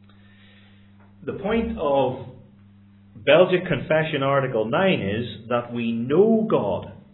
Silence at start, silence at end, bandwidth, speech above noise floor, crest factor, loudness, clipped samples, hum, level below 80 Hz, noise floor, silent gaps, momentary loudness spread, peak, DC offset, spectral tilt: 1.2 s; 0.2 s; 4.1 kHz; 30 dB; 20 dB; -22 LUFS; under 0.1%; none; -50 dBFS; -51 dBFS; none; 12 LU; -4 dBFS; under 0.1%; -10.5 dB/octave